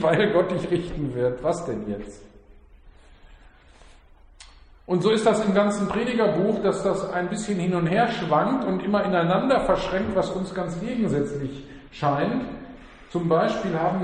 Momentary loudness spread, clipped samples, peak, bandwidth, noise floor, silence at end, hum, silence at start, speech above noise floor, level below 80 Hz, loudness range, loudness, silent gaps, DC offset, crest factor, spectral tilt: 10 LU; under 0.1%; -6 dBFS; 10 kHz; -51 dBFS; 0 s; none; 0 s; 28 dB; -48 dBFS; 9 LU; -24 LUFS; none; under 0.1%; 18 dB; -6.5 dB/octave